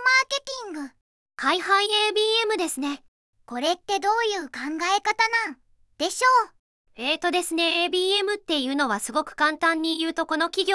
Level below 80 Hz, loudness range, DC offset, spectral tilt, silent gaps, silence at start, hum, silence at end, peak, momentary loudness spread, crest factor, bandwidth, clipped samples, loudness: -66 dBFS; 2 LU; under 0.1%; -1 dB/octave; 1.01-1.26 s, 3.08-3.33 s, 6.59-6.85 s; 0 s; none; 0 s; -8 dBFS; 11 LU; 16 dB; 12 kHz; under 0.1%; -23 LUFS